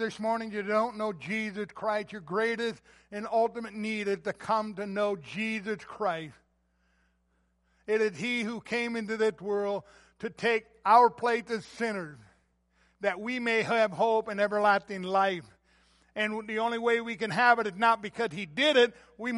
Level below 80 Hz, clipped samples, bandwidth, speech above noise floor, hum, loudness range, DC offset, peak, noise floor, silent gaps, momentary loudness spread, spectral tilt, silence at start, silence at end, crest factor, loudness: -70 dBFS; under 0.1%; 11.5 kHz; 43 dB; none; 6 LU; under 0.1%; -8 dBFS; -72 dBFS; none; 12 LU; -4.5 dB/octave; 0 s; 0 s; 22 dB; -29 LUFS